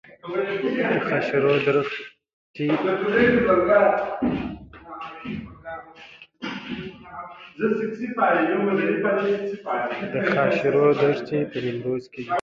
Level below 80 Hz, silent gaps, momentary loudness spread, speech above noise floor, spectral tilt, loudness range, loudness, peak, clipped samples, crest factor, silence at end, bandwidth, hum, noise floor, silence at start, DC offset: -54 dBFS; 2.33-2.54 s; 19 LU; 25 dB; -7.5 dB/octave; 10 LU; -22 LUFS; -6 dBFS; under 0.1%; 18 dB; 0 s; 7.2 kHz; none; -47 dBFS; 0.25 s; under 0.1%